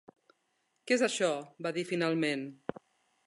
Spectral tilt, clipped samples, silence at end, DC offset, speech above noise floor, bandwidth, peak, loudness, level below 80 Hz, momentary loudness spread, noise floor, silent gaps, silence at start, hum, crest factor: -4 dB/octave; under 0.1%; 0.7 s; under 0.1%; 46 dB; 11.5 kHz; -14 dBFS; -32 LUFS; -80 dBFS; 14 LU; -78 dBFS; none; 0.85 s; none; 20 dB